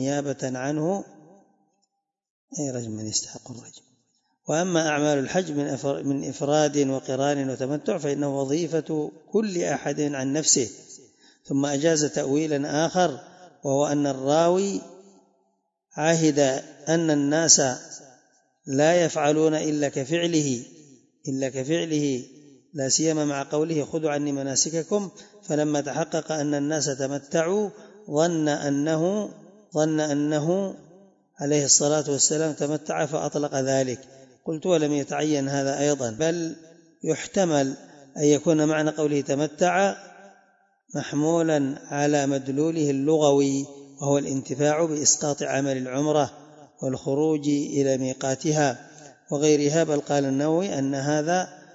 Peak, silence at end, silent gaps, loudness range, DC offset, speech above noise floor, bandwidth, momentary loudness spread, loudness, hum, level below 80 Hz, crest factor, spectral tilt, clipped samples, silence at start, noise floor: -2 dBFS; 0.15 s; 2.30-2.48 s; 4 LU; under 0.1%; 53 dB; 8 kHz; 11 LU; -24 LUFS; none; -70 dBFS; 22 dB; -4 dB/octave; under 0.1%; 0 s; -77 dBFS